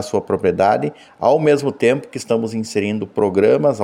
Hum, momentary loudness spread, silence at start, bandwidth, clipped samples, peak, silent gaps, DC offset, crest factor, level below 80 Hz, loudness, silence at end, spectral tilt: none; 7 LU; 0 s; 12.5 kHz; under 0.1%; -2 dBFS; none; under 0.1%; 16 dB; -60 dBFS; -18 LUFS; 0 s; -6 dB/octave